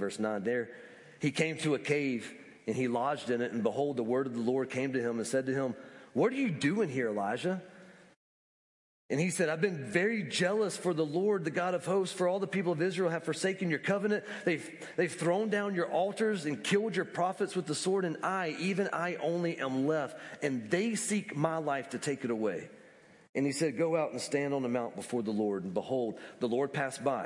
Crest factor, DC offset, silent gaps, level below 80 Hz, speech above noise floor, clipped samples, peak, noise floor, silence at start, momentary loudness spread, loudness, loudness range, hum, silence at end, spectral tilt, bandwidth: 18 dB; under 0.1%; 8.16-9.09 s, 23.29-23.33 s; -82 dBFS; 26 dB; under 0.1%; -14 dBFS; -58 dBFS; 0 s; 6 LU; -32 LUFS; 3 LU; none; 0 s; -5 dB/octave; 11.5 kHz